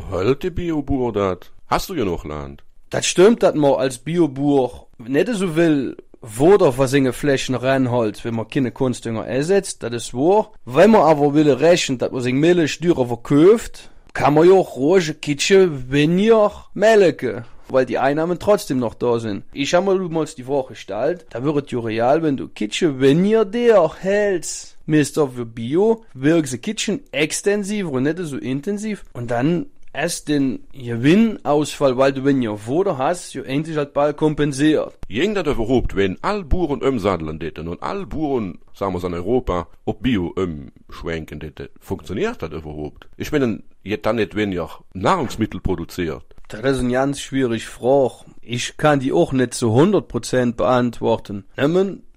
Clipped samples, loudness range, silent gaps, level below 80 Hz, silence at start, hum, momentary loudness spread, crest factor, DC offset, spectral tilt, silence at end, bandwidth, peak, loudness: under 0.1%; 7 LU; none; -40 dBFS; 0 s; none; 13 LU; 14 dB; under 0.1%; -5.5 dB/octave; 0.05 s; 15.5 kHz; -4 dBFS; -19 LUFS